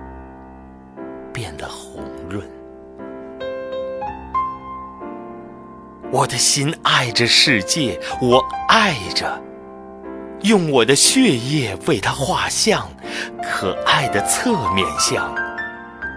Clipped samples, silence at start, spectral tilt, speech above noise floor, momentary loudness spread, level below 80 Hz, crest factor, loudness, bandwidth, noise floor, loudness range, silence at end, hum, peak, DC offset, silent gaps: under 0.1%; 0 s; -3 dB/octave; 22 dB; 21 LU; -46 dBFS; 20 dB; -17 LUFS; 11 kHz; -40 dBFS; 14 LU; 0 s; none; 0 dBFS; under 0.1%; none